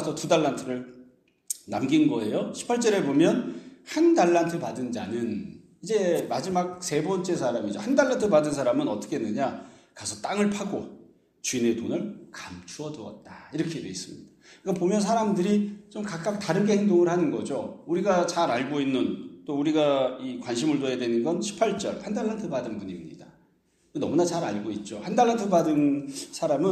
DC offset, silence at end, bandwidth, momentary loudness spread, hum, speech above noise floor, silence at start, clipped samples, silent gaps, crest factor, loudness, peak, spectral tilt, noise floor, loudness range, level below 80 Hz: under 0.1%; 0 s; 13.5 kHz; 15 LU; none; 40 dB; 0 s; under 0.1%; none; 18 dB; -26 LUFS; -8 dBFS; -5.5 dB/octave; -66 dBFS; 6 LU; -66 dBFS